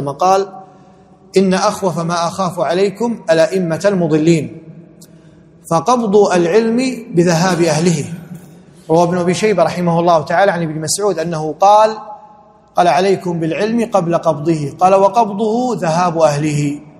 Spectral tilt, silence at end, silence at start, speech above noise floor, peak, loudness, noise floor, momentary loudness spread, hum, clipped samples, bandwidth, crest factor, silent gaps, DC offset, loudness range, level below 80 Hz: -5.5 dB/octave; 0.1 s; 0 s; 31 dB; 0 dBFS; -14 LUFS; -44 dBFS; 7 LU; none; under 0.1%; 14 kHz; 14 dB; none; under 0.1%; 2 LU; -54 dBFS